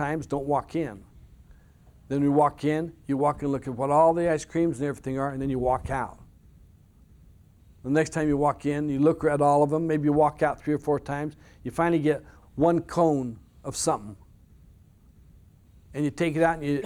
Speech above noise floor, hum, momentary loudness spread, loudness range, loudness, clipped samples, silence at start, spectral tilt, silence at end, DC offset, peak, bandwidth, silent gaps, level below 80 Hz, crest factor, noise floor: 30 dB; none; 11 LU; 6 LU; -26 LUFS; under 0.1%; 0 s; -6.5 dB/octave; 0 s; under 0.1%; -8 dBFS; 14.5 kHz; none; -50 dBFS; 18 dB; -55 dBFS